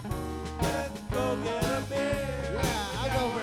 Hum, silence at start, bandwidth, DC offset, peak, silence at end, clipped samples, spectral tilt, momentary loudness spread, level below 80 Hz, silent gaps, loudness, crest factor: none; 0 s; 19 kHz; under 0.1%; -14 dBFS; 0 s; under 0.1%; -5 dB/octave; 5 LU; -42 dBFS; none; -31 LUFS; 16 dB